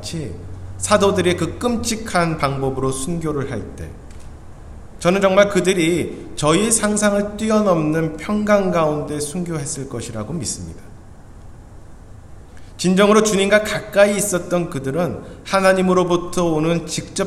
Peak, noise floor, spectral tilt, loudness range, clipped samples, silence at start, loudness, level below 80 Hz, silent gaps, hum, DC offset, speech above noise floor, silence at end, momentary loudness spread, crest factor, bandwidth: 0 dBFS; -39 dBFS; -4.5 dB/octave; 7 LU; under 0.1%; 0 s; -18 LUFS; -40 dBFS; none; none; under 0.1%; 21 dB; 0 s; 13 LU; 18 dB; 15 kHz